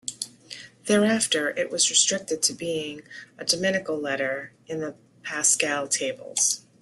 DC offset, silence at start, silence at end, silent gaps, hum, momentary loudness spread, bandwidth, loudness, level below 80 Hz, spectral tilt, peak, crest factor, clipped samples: under 0.1%; 0.05 s; 0.2 s; none; none; 16 LU; 12.5 kHz; -24 LUFS; -70 dBFS; -1.5 dB/octave; -6 dBFS; 20 dB; under 0.1%